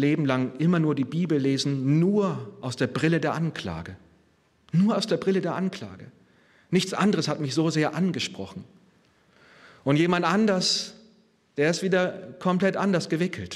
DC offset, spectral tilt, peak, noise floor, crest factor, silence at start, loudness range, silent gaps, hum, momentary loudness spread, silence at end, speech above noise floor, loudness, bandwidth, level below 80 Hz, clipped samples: under 0.1%; -5.5 dB/octave; -8 dBFS; -63 dBFS; 18 dB; 0 s; 3 LU; none; none; 12 LU; 0 s; 39 dB; -25 LUFS; 12.5 kHz; -64 dBFS; under 0.1%